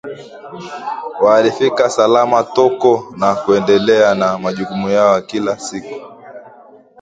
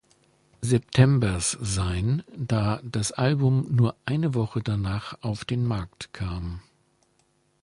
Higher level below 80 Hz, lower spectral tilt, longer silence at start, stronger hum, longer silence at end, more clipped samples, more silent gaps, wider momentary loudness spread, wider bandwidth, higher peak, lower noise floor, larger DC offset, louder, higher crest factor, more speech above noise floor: second, -56 dBFS vs -44 dBFS; about the same, -5 dB/octave vs -6 dB/octave; second, 0.05 s vs 0.6 s; neither; second, 0.55 s vs 1 s; neither; neither; first, 19 LU vs 12 LU; second, 9.2 kHz vs 11.5 kHz; first, 0 dBFS vs -6 dBFS; second, -42 dBFS vs -67 dBFS; neither; first, -14 LUFS vs -26 LUFS; about the same, 14 dB vs 18 dB; second, 28 dB vs 43 dB